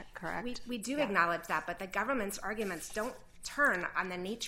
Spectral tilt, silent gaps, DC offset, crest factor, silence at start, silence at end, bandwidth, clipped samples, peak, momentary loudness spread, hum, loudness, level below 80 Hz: -3.5 dB/octave; none; under 0.1%; 22 dB; 0 s; 0 s; 16 kHz; under 0.1%; -14 dBFS; 10 LU; none; -34 LUFS; -58 dBFS